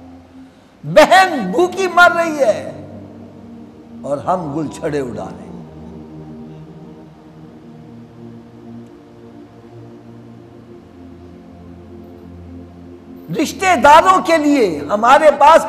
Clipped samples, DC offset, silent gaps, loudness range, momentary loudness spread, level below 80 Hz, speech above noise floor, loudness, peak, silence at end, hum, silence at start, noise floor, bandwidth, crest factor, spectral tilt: under 0.1%; under 0.1%; none; 24 LU; 28 LU; -48 dBFS; 29 dB; -13 LUFS; 0 dBFS; 0 s; none; 0.15 s; -42 dBFS; 15.5 kHz; 16 dB; -4.5 dB/octave